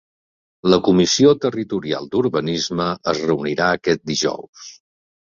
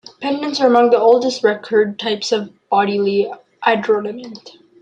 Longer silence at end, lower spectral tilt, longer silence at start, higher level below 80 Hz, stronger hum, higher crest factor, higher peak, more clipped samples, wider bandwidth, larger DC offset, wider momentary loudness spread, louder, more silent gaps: first, 0.5 s vs 0.3 s; about the same, -4.5 dB/octave vs -4.5 dB/octave; first, 0.65 s vs 0.2 s; first, -52 dBFS vs -66 dBFS; neither; about the same, 18 dB vs 14 dB; about the same, -2 dBFS vs -2 dBFS; neither; second, 7.6 kHz vs 9 kHz; neither; about the same, 10 LU vs 11 LU; about the same, -18 LUFS vs -16 LUFS; first, 4.49-4.53 s vs none